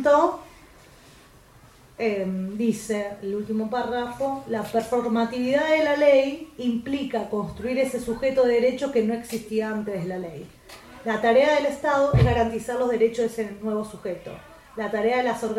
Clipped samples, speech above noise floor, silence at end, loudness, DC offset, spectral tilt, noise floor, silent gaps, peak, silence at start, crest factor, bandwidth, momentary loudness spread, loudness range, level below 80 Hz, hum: under 0.1%; 28 dB; 0 s; -24 LUFS; under 0.1%; -6 dB/octave; -52 dBFS; none; -6 dBFS; 0 s; 18 dB; 15.5 kHz; 13 LU; 5 LU; -46 dBFS; none